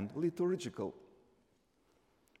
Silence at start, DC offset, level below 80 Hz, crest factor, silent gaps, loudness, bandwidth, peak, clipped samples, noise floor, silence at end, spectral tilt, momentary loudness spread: 0 s; under 0.1%; -80 dBFS; 16 dB; none; -38 LUFS; 12 kHz; -24 dBFS; under 0.1%; -74 dBFS; 1.35 s; -6.5 dB/octave; 11 LU